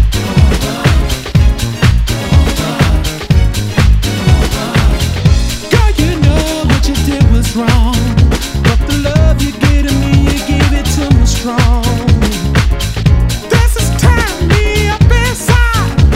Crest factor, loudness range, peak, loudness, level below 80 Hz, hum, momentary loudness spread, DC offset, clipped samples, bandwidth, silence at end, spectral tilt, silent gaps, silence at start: 10 dB; 1 LU; 0 dBFS; -11 LUFS; -14 dBFS; none; 3 LU; under 0.1%; 1%; 16 kHz; 0 s; -5.5 dB/octave; none; 0 s